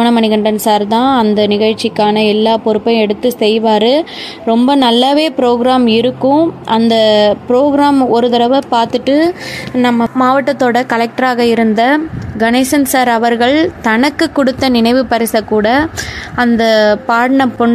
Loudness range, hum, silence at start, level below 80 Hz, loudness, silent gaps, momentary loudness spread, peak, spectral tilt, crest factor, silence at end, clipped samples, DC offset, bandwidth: 2 LU; none; 0 s; -44 dBFS; -11 LUFS; none; 4 LU; 0 dBFS; -4.5 dB/octave; 10 dB; 0 s; under 0.1%; under 0.1%; 15 kHz